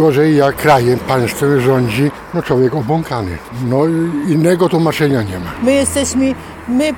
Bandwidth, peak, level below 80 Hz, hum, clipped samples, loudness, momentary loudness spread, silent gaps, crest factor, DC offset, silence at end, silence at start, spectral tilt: 18.5 kHz; -2 dBFS; -42 dBFS; none; under 0.1%; -14 LUFS; 9 LU; none; 12 dB; under 0.1%; 0 s; 0 s; -6 dB/octave